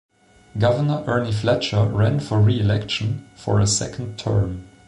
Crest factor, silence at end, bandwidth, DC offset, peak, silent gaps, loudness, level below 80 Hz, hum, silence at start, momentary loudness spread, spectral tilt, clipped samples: 12 dB; 0.2 s; 11 kHz; under 0.1%; -8 dBFS; none; -21 LUFS; -42 dBFS; none; 0.55 s; 9 LU; -5.5 dB/octave; under 0.1%